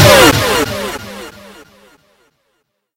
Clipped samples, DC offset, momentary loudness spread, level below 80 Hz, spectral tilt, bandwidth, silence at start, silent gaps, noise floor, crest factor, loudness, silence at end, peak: 0.7%; under 0.1%; 24 LU; -34 dBFS; -3.5 dB/octave; over 20 kHz; 0 s; none; -66 dBFS; 14 dB; -10 LUFS; 1.65 s; 0 dBFS